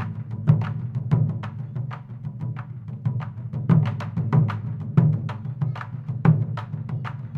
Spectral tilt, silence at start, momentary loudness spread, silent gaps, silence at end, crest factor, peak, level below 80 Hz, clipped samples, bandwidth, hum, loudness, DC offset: -10 dB/octave; 0 s; 12 LU; none; 0 s; 20 dB; -4 dBFS; -54 dBFS; under 0.1%; 4.7 kHz; none; -25 LUFS; under 0.1%